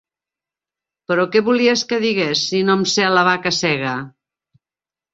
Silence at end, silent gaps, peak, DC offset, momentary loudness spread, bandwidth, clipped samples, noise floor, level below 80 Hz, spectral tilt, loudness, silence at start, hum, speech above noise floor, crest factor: 1.05 s; none; -2 dBFS; under 0.1%; 7 LU; 8 kHz; under 0.1%; under -90 dBFS; -62 dBFS; -4 dB/octave; -17 LUFS; 1.1 s; none; over 73 dB; 18 dB